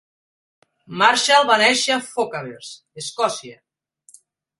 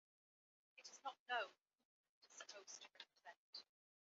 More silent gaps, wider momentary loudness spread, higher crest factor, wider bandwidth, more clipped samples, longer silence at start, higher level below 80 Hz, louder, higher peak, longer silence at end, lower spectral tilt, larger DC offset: second, none vs 1.19-1.26 s, 1.61-1.66 s, 1.85-2.21 s, 3.37-3.53 s; first, 20 LU vs 15 LU; about the same, 22 dB vs 24 dB; first, 11.5 kHz vs 7.6 kHz; neither; first, 0.9 s vs 0.75 s; first, -68 dBFS vs under -90 dBFS; first, -17 LUFS vs -53 LUFS; first, 0 dBFS vs -32 dBFS; first, 1.05 s vs 0.5 s; first, -1.5 dB/octave vs 4 dB/octave; neither